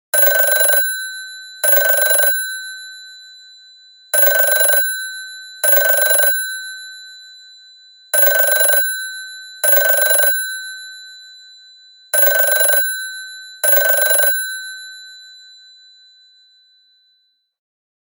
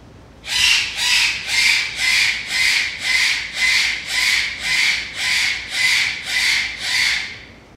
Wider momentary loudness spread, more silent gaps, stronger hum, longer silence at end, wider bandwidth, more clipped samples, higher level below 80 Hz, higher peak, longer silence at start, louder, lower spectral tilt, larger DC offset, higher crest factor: first, 21 LU vs 5 LU; neither; neither; first, 2.75 s vs 0.15 s; first, 19 kHz vs 16 kHz; neither; second, -84 dBFS vs -48 dBFS; about the same, 0 dBFS vs -2 dBFS; first, 0.15 s vs 0 s; first, -12 LUFS vs -16 LUFS; second, 4.5 dB/octave vs 1.5 dB/octave; neither; about the same, 18 dB vs 16 dB